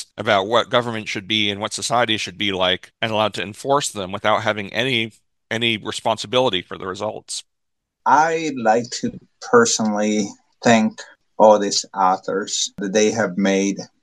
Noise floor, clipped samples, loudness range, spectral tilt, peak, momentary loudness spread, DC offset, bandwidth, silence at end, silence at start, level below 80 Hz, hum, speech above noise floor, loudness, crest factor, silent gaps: -78 dBFS; under 0.1%; 4 LU; -3.5 dB/octave; 0 dBFS; 11 LU; under 0.1%; 12.5 kHz; 0.15 s; 0 s; -62 dBFS; none; 58 dB; -19 LUFS; 20 dB; none